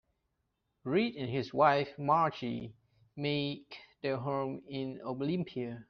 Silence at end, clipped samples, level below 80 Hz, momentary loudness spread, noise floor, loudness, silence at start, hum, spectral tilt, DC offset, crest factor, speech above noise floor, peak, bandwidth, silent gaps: 0.05 s; under 0.1%; -70 dBFS; 15 LU; -82 dBFS; -33 LUFS; 0.85 s; none; -4.5 dB/octave; under 0.1%; 22 dB; 49 dB; -12 dBFS; 6.4 kHz; none